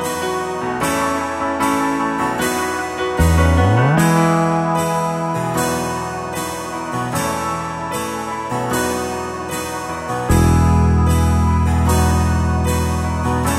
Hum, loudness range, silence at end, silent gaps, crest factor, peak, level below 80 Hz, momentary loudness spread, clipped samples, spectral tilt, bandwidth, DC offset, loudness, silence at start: none; 6 LU; 0 s; none; 14 dB; -2 dBFS; -26 dBFS; 10 LU; under 0.1%; -5.5 dB/octave; 15 kHz; under 0.1%; -18 LUFS; 0 s